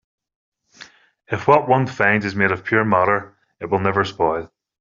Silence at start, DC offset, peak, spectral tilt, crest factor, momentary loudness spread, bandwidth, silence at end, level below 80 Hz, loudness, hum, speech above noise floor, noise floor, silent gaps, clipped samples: 0.8 s; under 0.1%; -2 dBFS; -4.5 dB/octave; 18 dB; 8 LU; 7.4 kHz; 0.35 s; -56 dBFS; -19 LUFS; none; 28 dB; -46 dBFS; none; under 0.1%